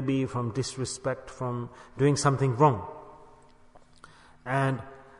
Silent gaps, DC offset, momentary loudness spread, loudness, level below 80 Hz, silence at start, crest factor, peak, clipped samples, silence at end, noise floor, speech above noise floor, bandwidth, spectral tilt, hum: none; under 0.1%; 15 LU; -28 LUFS; -58 dBFS; 0 s; 20 dB; -8 dBFS; under 0.1%; 0.2 s; -55 dBFS; 27 dB; 11 kHz; -6 dB/octave; none